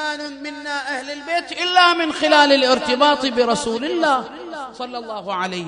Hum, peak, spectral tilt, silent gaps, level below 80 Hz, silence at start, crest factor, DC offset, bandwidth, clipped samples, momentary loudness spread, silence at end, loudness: none; 0 dBFS; -2.5 dB/octave; none; -58 dBFS; 0 s; 18 dB; under 0.1%; 10 kHz; under 0.1%; 16 LU; 0 s; -18 LUFS